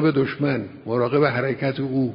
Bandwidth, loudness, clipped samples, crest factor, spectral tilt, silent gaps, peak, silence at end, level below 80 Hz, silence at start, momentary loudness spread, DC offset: 5.4 kHz; -22 LUFS; under 0.1%; 16 dB; -12 dB/octave; none; -4 dBFS; 0 s; -56 dBFS; 0 s; 6 LU; under 0.1%